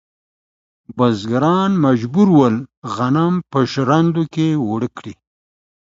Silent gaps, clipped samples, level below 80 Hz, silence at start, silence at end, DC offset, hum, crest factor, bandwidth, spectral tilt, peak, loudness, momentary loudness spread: 2.77-2.82 s; under 0.1%; -54 dBFS; 0.9 s; 0.8 s; under 0.1%; none; 16 dB; 7.8 kHz; -7.5 dB/octave; 0 dBFS; -16 LUFS; 12 LU